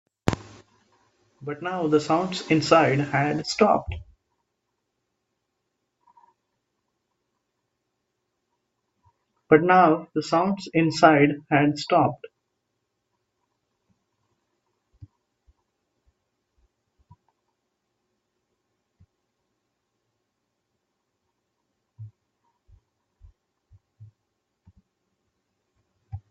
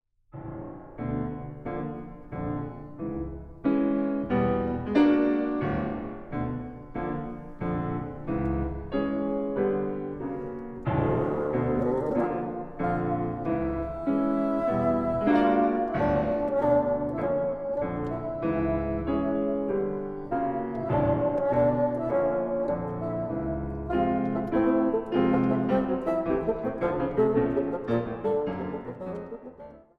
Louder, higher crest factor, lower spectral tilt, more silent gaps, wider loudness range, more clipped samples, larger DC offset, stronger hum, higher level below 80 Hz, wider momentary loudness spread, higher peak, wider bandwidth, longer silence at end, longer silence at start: first, -21 LUFS vs -28 LUFS; first, 28 dB vs 16 dB; second, -6 dB/octave vs -10 dB/octave; neither; first, 9 LU vs 6 LU; neither; neither; neither; second, -56 dBFS vs -46 dBFS; first, 19 LU vs 12 LU; first, 0 dBFS vs -10 dBFS; first, 8 kHz vs 5.8 kHz; about the same, 0.15 s vs 0.2 s; about the same, 0.25 s vs 0.35 s